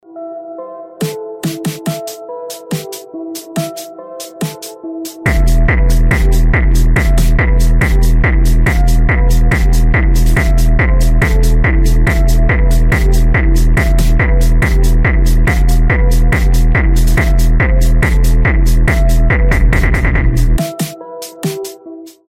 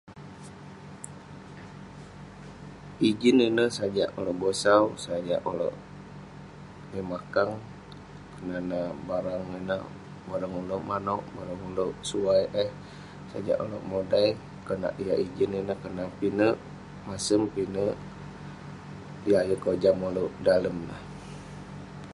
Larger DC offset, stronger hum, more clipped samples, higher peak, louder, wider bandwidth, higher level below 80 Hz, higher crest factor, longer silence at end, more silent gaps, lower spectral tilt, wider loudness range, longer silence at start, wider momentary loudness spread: neither; second, none vs 50 Hz at -60 dBFS; neither; first, 0 dBFS vs -6 dBFS; first, -13 LUFS vs -28 LUFS; first, 15.5 kHz vs 11.5 kHz; first, -10 dBFS vs -56 dBFS; second, 10 dB vs 22 dB; first, 0.2 s vs 0 s; neither; about the same, -6 dB/octave vs -5.5 dB/octave; about the same, 10 LU vs 8 LU; about the same, 0.15 s vs 0.05 s; second, 13 LU vs 20 LU